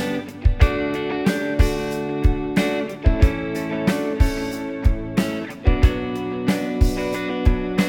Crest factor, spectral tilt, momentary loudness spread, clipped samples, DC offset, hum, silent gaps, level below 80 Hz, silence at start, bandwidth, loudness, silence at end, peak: 18 dB; -6.5 dB/octave; 6 LU; under 0.1%; under 0.1%; none; none; -22 dBFS; 0 s; 17 kHz; -22 LUFS; 0 s; 0 dBFS